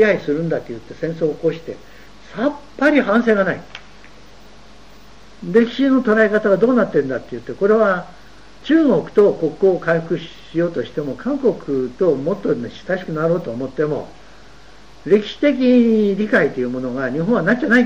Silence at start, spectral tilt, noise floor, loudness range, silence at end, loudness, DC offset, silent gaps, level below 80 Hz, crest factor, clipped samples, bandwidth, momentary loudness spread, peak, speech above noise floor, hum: 0 s; -7.5 dB/octave; -45 dBFS; 4 LU; 0 s; -18 LUFS; 0.9%; none; -50 dBFS; 16 dB; under 0.1%; 8.2 kHz; 12 LU; -2 dBFS; 28 dB; none